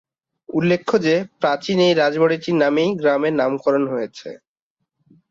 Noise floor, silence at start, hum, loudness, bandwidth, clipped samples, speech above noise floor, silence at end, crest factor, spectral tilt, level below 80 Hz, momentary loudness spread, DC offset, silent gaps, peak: -79 dBFS; 0.5 s; none; -19 LUFS; 7.6 kHz; under 0.1%; 60 dB; 0.95 s; 16 dB; -6 dB/octave; -64 dBFS; 10 LU; under 0.1%; none; -4 dBFS